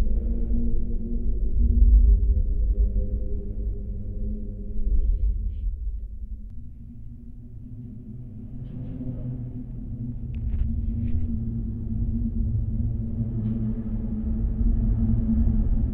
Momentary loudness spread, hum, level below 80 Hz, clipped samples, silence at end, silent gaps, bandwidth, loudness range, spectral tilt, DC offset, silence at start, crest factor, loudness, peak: 16 LU; none; -24 dBFS; under 0.1%; 0 s; none; 1.4 kHz; 12 LU; -13.5 dB/octave; under 0.1%; 0 s; 16 dB; -28 LUFS; -6 dBFS